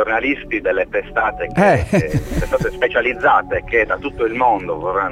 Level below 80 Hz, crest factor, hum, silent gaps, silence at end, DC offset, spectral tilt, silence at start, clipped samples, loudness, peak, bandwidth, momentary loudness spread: -34 dBFS; 14 dB; none; none; 0 s; under 0.1%; -6.5 dB/octave; 0 s; under 0.1%; -17 LUFS; -2 dBFS; 16 kHz; 6 LU